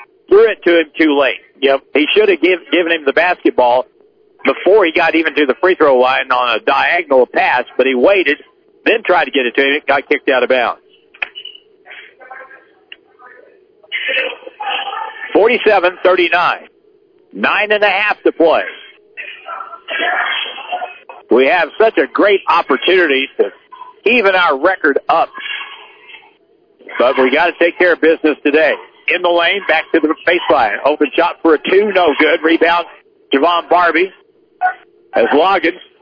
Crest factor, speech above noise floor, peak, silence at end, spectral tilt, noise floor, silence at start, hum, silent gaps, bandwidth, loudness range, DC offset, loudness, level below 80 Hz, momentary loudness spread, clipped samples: 12 dB; 40 dB; -2 dBFS; 0.25 s; -5.5 dB/octave; -52 dBFS; 0 s; none; none; 5.4 kHz; 5 LU; under 0.1%; -13 LUFS; -56 dBFS; 12 LU; under 0.1%